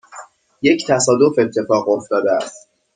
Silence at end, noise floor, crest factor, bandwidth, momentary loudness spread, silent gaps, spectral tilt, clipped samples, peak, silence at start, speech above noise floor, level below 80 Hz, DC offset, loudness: 0.35 s; -40 dBFS; 16 dB; 9.6 kHz; 6 LU; none; -4 dB/octave; under 0.1%; -2 dBFS; 0.15 s; 24 dB; -60 dBFS; under 0.1%; -16 LUFS